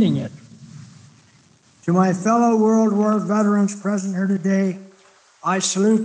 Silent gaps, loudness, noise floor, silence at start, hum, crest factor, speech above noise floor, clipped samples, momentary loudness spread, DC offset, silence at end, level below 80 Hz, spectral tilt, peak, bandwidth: none; -19 LUFS; -54 dBFS; 0 s; none; 14 dB; 36 dB; under 0.1%; 10 LU; under 0.1%; 0 s; -72 dBFS; -6 dB/octave; -6 dBFS; 9.6 kHz